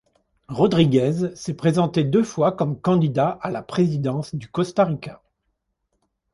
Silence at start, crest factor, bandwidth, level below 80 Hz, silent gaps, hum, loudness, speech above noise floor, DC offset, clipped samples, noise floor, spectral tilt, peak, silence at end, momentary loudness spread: 0.5 s; 18 dB; 11.5 kHz; -56 dBFS; none; none; -21 LUFS; 54 dB; under 0.1%; under 0.1%; -74 dBFS; -7.5 dB/octave; -4 dBFS; 1.2 s; 11 LU